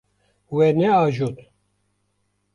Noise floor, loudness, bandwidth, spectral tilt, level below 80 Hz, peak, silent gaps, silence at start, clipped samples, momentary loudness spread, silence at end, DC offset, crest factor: -70 dBFS; -20 LUFS; 10.5 kHz; -8 dB/octave; -60 dBFS; -8 dBFS; none; 0.5 s; under 0.1%; 11 LU; 1.2 s; under 0.1%; 16 dB